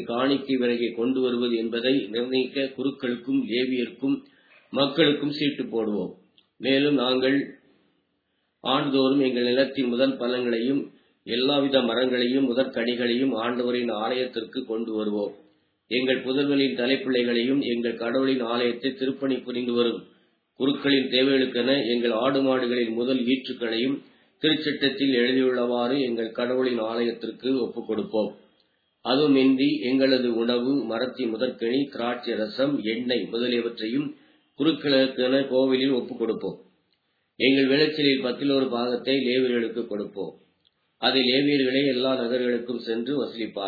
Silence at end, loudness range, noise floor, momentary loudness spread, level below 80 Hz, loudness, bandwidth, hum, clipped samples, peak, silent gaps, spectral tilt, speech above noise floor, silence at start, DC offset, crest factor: 0 s; 3 LU; -74 dBFS; 8 LU; -76 dBFS; -24 LUFS; 4.9 kHz; none; under 0.1%; -6 dBFS; none; -7.5 dB/octave; 50 dB; 0 s; under 0.1%; 18 dB